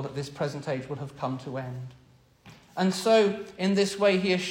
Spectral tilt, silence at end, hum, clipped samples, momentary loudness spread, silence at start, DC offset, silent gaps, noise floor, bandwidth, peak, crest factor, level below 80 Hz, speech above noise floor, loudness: -5.5 dB/octave; 0 s; none; under 0.1%; 16 LU; 0 s; under 0.1%; none; -54 dBFS; 16.5 kHz; -10 dBFS; 18 dB; -64 dBFS; 27 dB; -27 LUFS